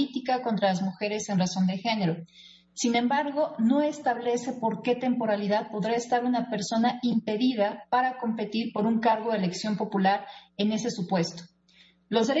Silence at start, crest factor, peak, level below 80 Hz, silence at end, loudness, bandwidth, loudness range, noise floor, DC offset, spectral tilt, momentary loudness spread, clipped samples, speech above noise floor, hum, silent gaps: 0 s; 16 dB; -12 dBFS; -70 dBFS; 0 s; -27 LUFS; 8 kHz; 1 LU; -60 dBFS; under 0.1%; -5.5 dB/octave; 5 LU; under 0.1%; 33 dB; none; none